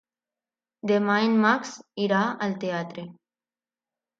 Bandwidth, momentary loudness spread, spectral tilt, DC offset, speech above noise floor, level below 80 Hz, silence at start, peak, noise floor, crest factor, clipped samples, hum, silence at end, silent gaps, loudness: 7.6 kHz; 16 LU; -5.5 dB/octave; under 0.1%; over 66 dB; -76 dBFS; 0.85 s; -8 dBFS; under -90 dBFS; 20 dB; under 0.1%; none; 1.1 s; none; -24 LUFS